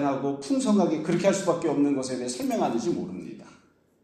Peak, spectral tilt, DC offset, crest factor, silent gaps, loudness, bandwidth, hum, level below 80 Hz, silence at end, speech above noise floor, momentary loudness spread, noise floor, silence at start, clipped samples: -10 dBFS; -5.5 dB/octave; under 0.1%; 18 dB; none; -26 LUFS; 14.5 kHz; none; -68 dBFS; 0.5 s; 34 dB; 12 LU; -60 dBFS; 0 s; under 0.1%